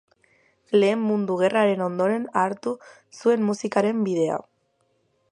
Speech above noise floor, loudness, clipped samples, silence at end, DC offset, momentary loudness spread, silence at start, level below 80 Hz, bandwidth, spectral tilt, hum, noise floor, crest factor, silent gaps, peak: 46 dB; -23 LUFS; under 0.1%; 0.9 s; under 0.1%; 7 LU; 0.7 s; -74 dBFS; 10.5 kHz; -6 dB/octave; none; -69 dBFS; 18 dB; none; -6 dBFS